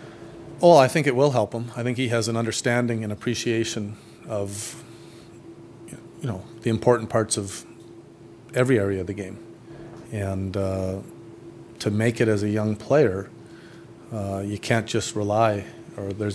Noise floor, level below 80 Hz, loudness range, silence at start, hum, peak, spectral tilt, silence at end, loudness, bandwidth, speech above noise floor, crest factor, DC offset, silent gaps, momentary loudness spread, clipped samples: -46 dBFS; -60 dBFS; 8 LU; 0 s; none; -2 dBFS; -5.5 dB/octave; 0 s; -24 LUFS; 11 kHz; 23 dB; 22 dB; under 0.1%; none; 23 LU; under 0.1%